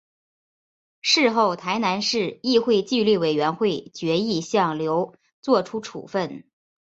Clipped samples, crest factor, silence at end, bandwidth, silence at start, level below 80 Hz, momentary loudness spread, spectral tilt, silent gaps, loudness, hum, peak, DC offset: under 0.1%; 18 dB; 0.5 s; 8 kHz; 1.05 s; -66 dBFS; 11 LU; -4.5 dB/octave; 5.33-5.43 s; -22 LUFS; none; -6 dBFS; under 0.1%